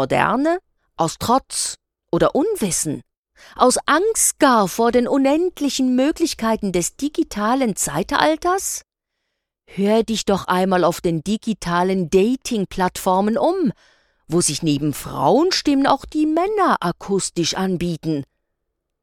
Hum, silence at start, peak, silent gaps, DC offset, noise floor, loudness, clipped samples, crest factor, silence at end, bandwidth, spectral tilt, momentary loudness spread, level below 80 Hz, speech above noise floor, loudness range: none; 0 s; 0 dBFS; 3.17-3.23 s; under 0.1%; -77 dBFS; -19 LUFS; under 0.1%; 20 dB; 0.8 s; 18 kHz; -4 dB/octave; 7 LU; -46 dBFS; 58 dB; 3 LU